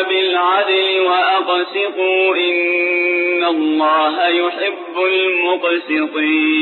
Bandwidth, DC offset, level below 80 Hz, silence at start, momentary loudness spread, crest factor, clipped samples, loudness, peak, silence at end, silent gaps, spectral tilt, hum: 4.3 kHz; under 0.1%; -72 dBFS; 0 s; 4 LU; 10 dB; under 0.1%; -15 LUFS; -4 dBFS; 0 s; none; -4.5 dB/octave; none